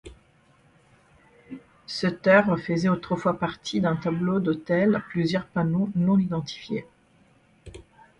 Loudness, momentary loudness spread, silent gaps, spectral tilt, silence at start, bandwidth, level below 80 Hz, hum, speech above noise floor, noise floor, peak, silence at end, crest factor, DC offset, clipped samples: -25 LUFS; 14 LU; none; -7 dB/octave; 0.05 s; 9.8 kHz; -56 dBFS; none; 36 dB; -60 dBFS; -6 dBFS; 0.4 s; 20 dB; under 0.1%; under 0.1%